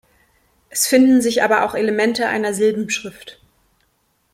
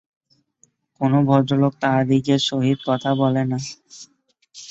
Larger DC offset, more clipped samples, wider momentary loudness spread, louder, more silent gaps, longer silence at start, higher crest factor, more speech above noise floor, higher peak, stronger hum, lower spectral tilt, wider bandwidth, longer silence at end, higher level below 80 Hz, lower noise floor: neither; neither; about the same, 11 LU vs 11 LU; about the same, -17 LUFS vs -19 LUFS; neither; second, 0.75 s vs 1 s; about the same, 16 dB vs 18 dB; first, 48 dB vs 43 dB; about the same, -2 dBFS vs -4 dBFS; neither; second, -3 dB/octave vs -6.5 dB/octave; first, 16.5 kHz vs 8 kHz; first, 1 s vs 0.05 s; about the same, -58 dBFS vs -62 dBFS; about the same, -64 dBFS vs -62 dBFS